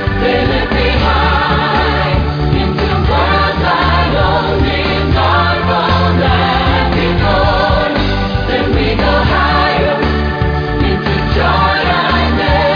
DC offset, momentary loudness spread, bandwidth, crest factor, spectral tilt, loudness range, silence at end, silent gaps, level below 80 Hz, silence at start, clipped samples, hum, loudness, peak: under 0.1%; 3 LU; 5.4 kHz; 12 dB; -7.5 dB/octave; 1 LU; 0 s; none; -20 dBFS; 0 s; under 0.1%; none; -12 LUFS; 0 dBFS